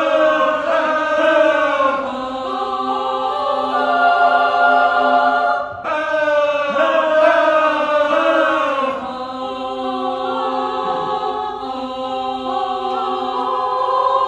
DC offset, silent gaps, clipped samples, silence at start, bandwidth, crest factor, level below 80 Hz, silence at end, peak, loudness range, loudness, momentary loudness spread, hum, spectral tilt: under 0.1%; none; under 0.1%; 0 s; 9.2 kHz; 16 dB; -54 dBFS; 0 s; -2 dBFS; 6 LU; -17 LUFS; 10 LU; none; -4 dB/octave